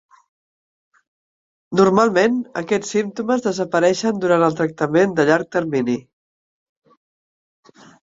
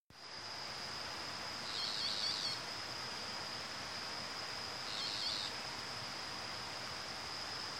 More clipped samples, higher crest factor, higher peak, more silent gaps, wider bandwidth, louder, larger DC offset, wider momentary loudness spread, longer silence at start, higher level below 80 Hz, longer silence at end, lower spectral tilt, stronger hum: neither; about the same, 20 dB vs 18 dB; first, 0 dBFS vs -26 dBFS; second, none vs 0.00-0.10 s; second, 7.8 kHz vs 16 kHz; first, -18 LUFS vs -40 LUFS; neither; about the same, 7 LU vs 6 LU; first, 1.7 s vs 0 s; first, -60 dBFS vs -72 dBFS; first, 2.15 s vs 0 s; first, -5.5 dB/octave vs -1.5 dB/octave; neither